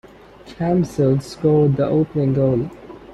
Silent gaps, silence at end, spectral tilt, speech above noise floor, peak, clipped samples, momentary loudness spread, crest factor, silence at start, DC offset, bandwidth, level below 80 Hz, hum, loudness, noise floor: none; 0 s; -9 dB/octave; 25 dB; -6 dBFS; under 0.1%; 9 LU; 14 dB; 0.45 s; under 0.1%; 11.5 kHz; -46 dBFS; none; -18 LUFS; -42 dBFS